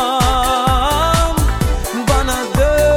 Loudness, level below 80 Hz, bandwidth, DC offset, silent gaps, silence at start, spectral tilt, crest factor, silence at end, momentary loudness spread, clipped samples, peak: -15 LUFS; -20 dBFS; over 20 kHz; under 0.1%; none; 0 s; -4.5 dB/octave; 12 dB; 0 s; 4 LU; under 0.1%; -2 dBFS